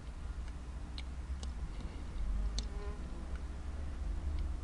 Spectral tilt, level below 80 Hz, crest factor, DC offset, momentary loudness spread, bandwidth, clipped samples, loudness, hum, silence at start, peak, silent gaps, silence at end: -5.5 dB/octave; -40 dBFS; 20 dB; under 0.1%; 5 LU; 11 kHz; under 0.1%; -44 LUFS; none; 0 s; -20 dBFS; none; 0 s